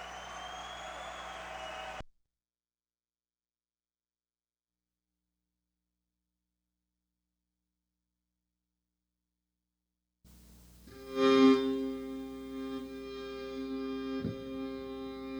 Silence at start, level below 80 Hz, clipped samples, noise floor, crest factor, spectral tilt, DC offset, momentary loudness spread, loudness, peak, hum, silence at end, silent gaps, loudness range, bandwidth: 0 s; -62 dBFS; under 0.1%; under -90 dBFS; 24 dB; -5 dB/octave; under 0.1%; 18 LU; -34 LUFS; -14 dBFS; 60 Hz at -80 dBFS; 0 s; none; 17 LU; over 20 kHz